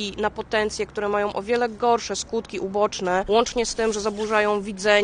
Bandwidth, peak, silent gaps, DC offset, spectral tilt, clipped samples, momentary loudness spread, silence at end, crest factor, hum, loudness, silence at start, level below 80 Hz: 10 kHz; -4 dBFS; none; under 0.1%; -3 dB/octave; under 0.1%; 6 LU; 0 s; 18 dB; none; -23 LUFS; 0 s; -48 dBFS